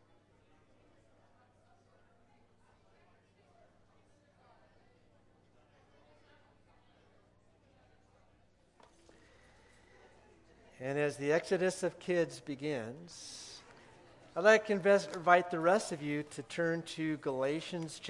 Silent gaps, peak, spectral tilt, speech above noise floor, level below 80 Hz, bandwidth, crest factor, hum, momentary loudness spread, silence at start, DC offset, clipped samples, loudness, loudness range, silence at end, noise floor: none; -10 dBFS; -5 dB/octave; 35 dB; -76 dBFS; 12 kHz; 28 dB; 60 Hz at -75 dBFS; 18 LU; 10.8 s; under 0.1%; under 0.1%; -33 LUFS; 8 LU; 0 s; -68 dBFS